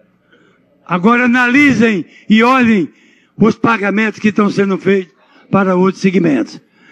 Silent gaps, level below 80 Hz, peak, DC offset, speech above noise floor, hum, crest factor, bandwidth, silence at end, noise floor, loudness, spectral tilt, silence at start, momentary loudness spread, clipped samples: none; -54 dBFS; 0 dBFS; under 0.1%; 39 dB; none; 14 dB; 8.4 kHz; 0.35 s; -51 dBFS; -12 LUFS; -6.5 dB/octave; 0.9 s; 8 LU; under 0.1%